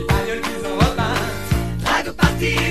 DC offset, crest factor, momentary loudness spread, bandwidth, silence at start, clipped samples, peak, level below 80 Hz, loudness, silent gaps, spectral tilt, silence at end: 2%; 16 dB; 6 LU; 16 kHz; 0 s; under 0.1%; -2 dBFS; -28 dBFS; -20 LUFS; none; -5 dB/octave; 0 s